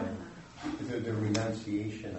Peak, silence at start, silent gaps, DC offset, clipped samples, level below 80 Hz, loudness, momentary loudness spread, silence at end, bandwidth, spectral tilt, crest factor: -16 dBFS; 0 s; none; under 0.1%; under 0.1%; -60 dBFS; -35 LUFS; 11 LU; 0 s; 8.2 kHz; -6 dB/octave; 18 dB